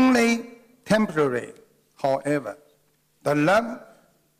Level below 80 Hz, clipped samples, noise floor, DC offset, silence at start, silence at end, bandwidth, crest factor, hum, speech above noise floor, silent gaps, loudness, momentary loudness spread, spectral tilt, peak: -60 dBFS; under 0.1%; -65 dBFS; under 0.1%; 0 s; 0.6 s; 15.5 kHz; 14 dB; none; 42 dB; none; -23 LUFS; 18 LU; -5.5 dB/octave; -10 dBFS